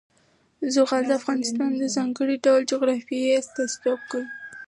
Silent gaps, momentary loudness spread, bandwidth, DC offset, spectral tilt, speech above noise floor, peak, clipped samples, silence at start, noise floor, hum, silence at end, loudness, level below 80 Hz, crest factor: none; 9 LU; 11.5 kHz; under 0.1%; -3 dB/octave; 40 dB; -8 dBFS; under 0.1%; 0.6 s; -63 dBFS; none; 0.05 s; -24 LUFS; -78 dBFS; 16 dB